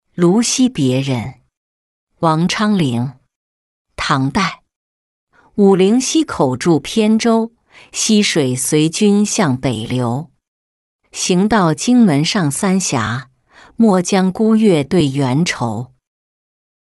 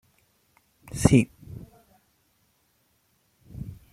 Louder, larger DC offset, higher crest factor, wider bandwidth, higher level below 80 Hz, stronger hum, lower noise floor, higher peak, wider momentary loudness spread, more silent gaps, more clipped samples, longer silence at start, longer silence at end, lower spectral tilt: first, -15 LUFS vs -22 LUFS; neither; second, 14 dB vs 28 dB; second, 12 kHz vs 14.5 kHz; about the same, -48 dBFS vs -48 dBFS; neither; second, -47 dBFS vs -69 dBFS; about the same, -2 dBFS vs -2 dBFS; second, 10 LU vs 25 LU; first, 1.57-2.07 s, 3.36-3.85 s, 4.76-5.27 s, 10.48-10.99 s vs none; neither; second, 0.2 s vs 0.95 s; first, 1.1 s vs 0.2 s; second, -5 dB/octave vs -6.5 dB/octave